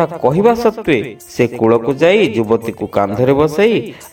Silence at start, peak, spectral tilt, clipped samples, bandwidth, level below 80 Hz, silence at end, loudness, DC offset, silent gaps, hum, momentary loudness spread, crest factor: 0 s; 0 dBFS; -6.5 dB/octave; under 0.1%; 17 kHz; -44 dBFS; 0.05 s; -14 LUFS; under 0.1%; none; none; 6 LU; 14 dB